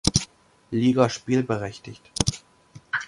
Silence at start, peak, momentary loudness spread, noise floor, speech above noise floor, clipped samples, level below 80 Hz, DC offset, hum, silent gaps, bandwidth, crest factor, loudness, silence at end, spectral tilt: 0.05 s; -2 dBFS; 18 LU; -51 dBFS; 27 dB; under 0.1%; -44 dBFS; under 0.1%; none; none; 11.5 kHz; 24 dB; -24 LUFS; 0 s; -4.5 dB/octave